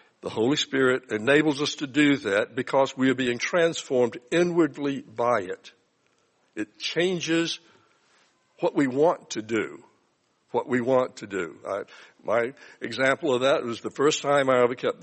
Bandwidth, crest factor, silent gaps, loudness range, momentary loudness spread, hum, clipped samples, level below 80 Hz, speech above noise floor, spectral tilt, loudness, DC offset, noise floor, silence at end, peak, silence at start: 8.8 kHz; 20 dB; none; 6 LU; 12 LU; none; under 0.1%; -70 dBFS; 44 dB; -4.5 dB/octave; -25 LUFS; under 0.1%; -69 dBFS; 0 s; -6 dBFS; 0.25 s